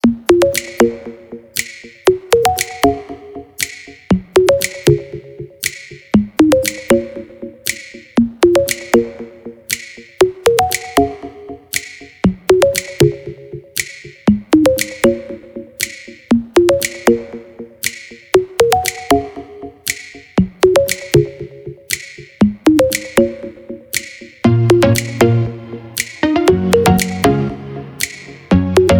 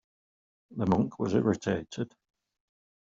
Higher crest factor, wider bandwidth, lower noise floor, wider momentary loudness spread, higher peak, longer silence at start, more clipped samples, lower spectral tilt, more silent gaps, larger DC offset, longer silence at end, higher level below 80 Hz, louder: second, 16 dB vs 22 dB; first, over 20 kHz vs 7.6 kHz; second, -32 dBFS vs under -90 dBFS; first, 19 LU vs 12 LU; first, 0 dBFS vs -10 dBFS; second, 0.05 s vs 0.7 s; neither; second, -5 dB/octave vs -7 dB/octave; neither; neither; second, 0 s vs 1 s; first, -38 dBFS vs -62 dBFS; first, -15 LUFS vs -30 LUFS